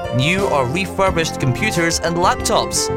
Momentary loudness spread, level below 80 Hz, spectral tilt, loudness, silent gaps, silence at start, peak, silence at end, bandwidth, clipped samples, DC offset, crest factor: 3 LU; -36 dBFS; -4 dB/octave; -17 LUFS; none; 0 s; -2 dBFS; 0 s; 16.5 kHz; under 0.1%; under 0.1%; 16 dB